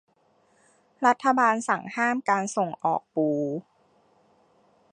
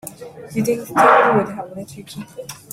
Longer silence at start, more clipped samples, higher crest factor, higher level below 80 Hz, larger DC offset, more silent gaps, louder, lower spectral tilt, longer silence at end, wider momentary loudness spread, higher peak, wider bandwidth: first, 1 s vs 0.05 s; neither; about the same, 20 dB vs 18 dB; second, -80 dBFS vs -58 dBFS; neither; neither; second, -25 LUFS vs -16 LUFS; about the same, -5 dB/octave vs -5 dB/octave; first, 1.3 s vs 0.15 s; second, 7 LU vs 22 LU; second, -6 dBFS vs -2 dBFS; second, 11 kHz vs 16 kHz